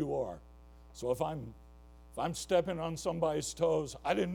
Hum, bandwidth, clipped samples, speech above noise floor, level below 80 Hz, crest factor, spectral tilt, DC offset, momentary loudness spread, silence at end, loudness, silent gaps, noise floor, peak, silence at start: none; 17.5 kHz; under 0.1%; 21 dB; -56 dBFS; 18 dB; -5 dB/octave; under 0.1%; 15 LU; 0 s; -35 LUFS; none; -55 dBFS; -16 dBFS; 0 s